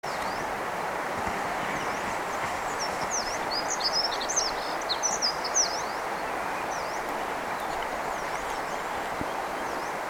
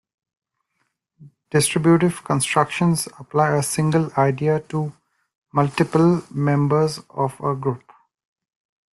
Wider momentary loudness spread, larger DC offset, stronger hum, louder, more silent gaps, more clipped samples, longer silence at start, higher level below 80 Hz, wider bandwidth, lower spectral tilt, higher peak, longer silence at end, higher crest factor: about the same, 7 LU vs 9 LU; neither; neither; second, -29 LUFS vs -20 LUFS; second, none vs 5.35-5.42 s; neither; second, 0.05 s vs 1.2 s; about the same, -54 dBFS vs -58 dBFS; first, 19.5 kHz vs 12.5 kHz; second, -1 dB/octave vs -5.5 dB/octave; second, -14 dBFS vs -4 dBFS; second, 0 s vs 1.2 s; about the same, 16 dB vs 18 dB